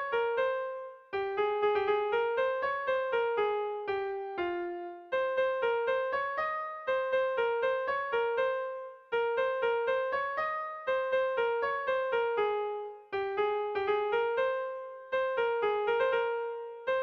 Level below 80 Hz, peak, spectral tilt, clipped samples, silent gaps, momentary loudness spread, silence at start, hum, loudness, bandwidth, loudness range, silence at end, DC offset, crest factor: -70 dBFS; -18 dBFS; -5 dB/octave; under 0.1%; none; 7 LU; 0 s; none; -31 LUFS; 6.4 kHz; 1 LU; 0 s; under 0.1%; 12 dB